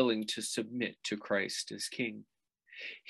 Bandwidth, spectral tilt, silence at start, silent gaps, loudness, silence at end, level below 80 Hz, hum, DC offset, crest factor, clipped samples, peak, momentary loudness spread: 13 kHz; -3 dB/octave; 0 s; none; -36 LUFS; 0 s; -82 dBFS; none; under 0.1%; 22 dB; under 0.1%; -14 dBFS; 12 LU